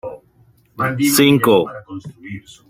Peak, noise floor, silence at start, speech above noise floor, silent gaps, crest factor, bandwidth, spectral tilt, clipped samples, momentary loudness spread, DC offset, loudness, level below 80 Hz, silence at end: -2 dBFS; -53 dBFS; 0.05 s; 37 dB; none; 16 dB; 16.5 kHz; -4.5 dB/octave; under 0.1%; 22 LU; under 0.1%; -15 LUFS; -56 dBFS; 0.3 s